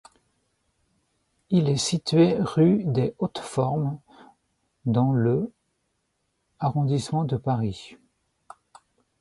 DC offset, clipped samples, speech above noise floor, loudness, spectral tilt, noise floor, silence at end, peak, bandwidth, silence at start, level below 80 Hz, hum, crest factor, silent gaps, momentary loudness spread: under 0.1%; under 0.1%; 52 dB; -24 LUFS; -6.5 dB/octave; -75 dBFS; 1.25 s; -8 dBFS; 11.5 kHz; 1.5 s; -58 dBFS; none; 18 dB; none; 11 LU